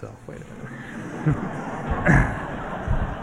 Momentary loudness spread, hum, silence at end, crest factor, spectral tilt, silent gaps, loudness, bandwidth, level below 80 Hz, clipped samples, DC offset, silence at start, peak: 19 LU; none; 0 s; 22 dB; -7.5 dB/octave; none; -25 LUFS; 11 kHz; -32 dBFS; under 0.1%; under 0.1%; 0 s; -4 dBFS